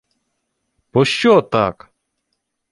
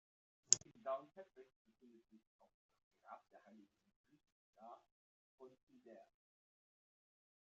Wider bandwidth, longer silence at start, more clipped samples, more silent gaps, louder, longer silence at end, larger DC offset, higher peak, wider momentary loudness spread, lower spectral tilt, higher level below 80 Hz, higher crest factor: first, 11.5 kHz vs 7.2 kHz; first, 0.95 s vs 0.5 s; neither; second, none vs 1.56-1.65 s, 2.27-2.39 s, 2.54-2.69 s, 2.83-2.91 s, 3.96-4.04 s, 4.32-4.53 s, 4.91-5.38 s, 5.63-5.67 s; first, -16 LUFS vs -39 LUFS; second, 1 s vs 1.45 s; neither; first, -2 dBFS vs -12 dBFS; second, 8 LU vs 29 LU; first, -5.5 dB/octave vs -1 dB/octave; first, -52 dBFS vs under -90 dBFS; second, 18 dB vs 40 dB